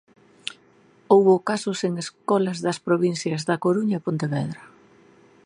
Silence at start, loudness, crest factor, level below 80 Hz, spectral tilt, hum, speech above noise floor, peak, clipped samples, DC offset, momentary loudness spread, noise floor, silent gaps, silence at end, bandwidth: 1.1 s; -23 LUFS; 22 dB; -70 dBFS; -6 dB/octave; none; 34 dB; -2 dBFS; under 0.1%; under 0.1%; 18 LU; -56 dBFS; none; 0.8 s; 11 kHz